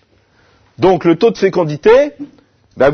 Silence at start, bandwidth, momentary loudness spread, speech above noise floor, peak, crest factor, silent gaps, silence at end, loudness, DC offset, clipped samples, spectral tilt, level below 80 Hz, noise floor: 0.8 s; 6.6 kHz; 12 LU; 41 dB; 0 dBFS; 14 dB; none; 0 s; -12 LUFS; under 0.1%; under 0.1%; -7 dB/octave; -42 dBFS; -53 dBFS